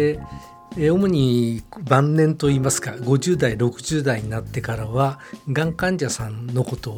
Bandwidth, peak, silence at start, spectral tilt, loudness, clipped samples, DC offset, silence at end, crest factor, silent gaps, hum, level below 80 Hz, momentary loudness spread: 16.5 kHz; 0 dBFS; 0 s; -6 dB/octave; -21 LUFS; under 0.1%; under 0.1%; 0 s; 20 dB; none; none; -44 dBFS; 9 LU